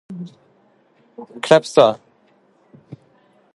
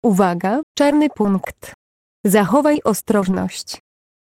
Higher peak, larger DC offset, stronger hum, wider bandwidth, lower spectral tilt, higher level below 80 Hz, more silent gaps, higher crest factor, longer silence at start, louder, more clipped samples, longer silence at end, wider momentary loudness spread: about the same, 0 dBFS vs -2 dBFS; neither; neither; second, 11.5 kHz vs 16.5 kHz; about the same, -5 dB/octave vs -5.5 dB/octave; second, -66 dBFS vs -52 dBFS; second, none vs 0.63-0.75 s, 1.74-2.24 s; first, 22 dB vs 16 dB; about the same, 0.1 s vs 0.05 s; about the same, -15 LUFS vs -17 LUFS; neither; first, 1.6 s vs 0.5 s; first, 25 LU vs 13 LU